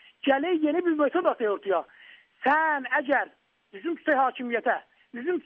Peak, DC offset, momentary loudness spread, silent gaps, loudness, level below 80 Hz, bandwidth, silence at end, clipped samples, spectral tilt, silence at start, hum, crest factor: -10 dBFS; under 0.1%; 11 LU; none; -26 LUFS; -78 dBFS; 4.7 kHz; 0.05 s; under 0.1%; -1 dB/octave; 0.25 s; none; 16 dB